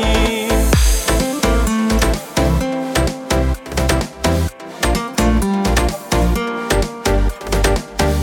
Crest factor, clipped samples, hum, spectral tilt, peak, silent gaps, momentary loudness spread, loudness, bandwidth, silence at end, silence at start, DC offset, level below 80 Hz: 16 dB; under 0.1%; none; -4.5 dB/octave; 0 dBFS; none; 4 LU; -17 LUFS; 18 kHz; 0 s; 0 s; under 0.1%; -20 dBFS